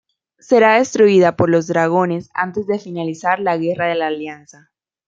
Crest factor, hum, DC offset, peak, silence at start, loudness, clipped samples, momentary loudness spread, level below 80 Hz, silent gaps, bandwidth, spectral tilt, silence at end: 14 dB; none; under 0.1%; -2 dBFS; 0.5 s; -16 LUFS; under 0.1%; 11 LU; -60 dBFS; none; 7.6 kHz; -6 dB/octave; 0.7 s